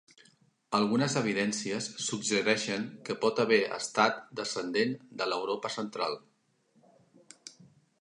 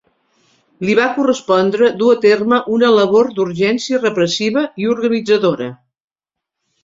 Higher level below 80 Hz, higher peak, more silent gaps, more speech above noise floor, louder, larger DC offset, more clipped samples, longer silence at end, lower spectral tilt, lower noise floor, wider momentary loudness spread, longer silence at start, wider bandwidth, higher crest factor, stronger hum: second, -78 dBFS vs -58 dBFS; second, -10 dBFS vs -2 dBFS; neither; second, 40 dB vs 69 dB; second, -30 LUFS vs -14 LUFS; neither; neither; second, 0.35 s vs 1.1 s; second, -3.5 dB/octave vs -5 dB/octave; second, -70 dBFS vs -83 dBFS; first, 9 LU vs 6 LU; about the same, 0.7 s vs 0.8 s; first, 11 kHz vs 7.8 kHz; first, 22 dB vs 14 dB; neither